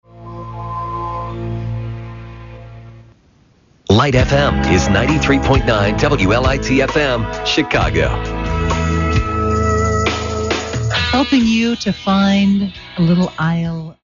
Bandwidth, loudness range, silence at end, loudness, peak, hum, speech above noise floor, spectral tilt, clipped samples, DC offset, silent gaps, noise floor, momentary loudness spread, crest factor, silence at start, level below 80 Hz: 7.6 kHz; 8 LU; 0.1 s; -16 LUFS; 0 dBFS; none; 38 dB; -5 dB/octave; under 0.1%; under 0.1%; none; -52 dBFS; 14 LU; 16 dB; 0.15 s; -26 dBFS